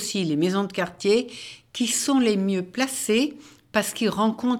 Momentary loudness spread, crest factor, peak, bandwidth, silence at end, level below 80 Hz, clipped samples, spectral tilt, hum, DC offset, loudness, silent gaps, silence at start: 7 LU; 18 dB; -6 dBFS; 18.5 kHz; 0 s; -64 dBFS; under 0.1%; -4 dB/octave; none; under 0.1%; -24 LUFS; none; 0 s